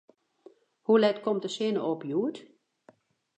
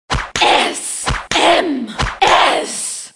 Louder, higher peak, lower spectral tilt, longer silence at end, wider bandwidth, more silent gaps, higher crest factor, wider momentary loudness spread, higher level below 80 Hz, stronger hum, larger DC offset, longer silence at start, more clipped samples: second, -28 LUFS vs -14 LUFS; second, -10 dBFS vs 0 dBFS; first, -5.5 dB/octave vs -2.5 dB/octave; first, 0.95 s vs 0.05 s; second, 9 kHz vs 11.5 kHz; neither; about the same, 20 dB vs 16 dB; first, 12 LU vs 9 LU; second, -86 dBFS vs -32 dBFS; neither; neither; first, 0.9 s vs 0.1 s; neither